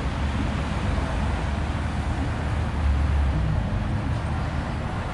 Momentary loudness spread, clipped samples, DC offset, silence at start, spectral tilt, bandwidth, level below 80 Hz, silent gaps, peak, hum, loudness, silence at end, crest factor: 4 LU; under 0.1%; under 0.1%; 0 s; -7 dB/octave; 11 kHz; -28 dBFS; none; -12 dBFS; none; -26 LUFS; 0 s; 12 dB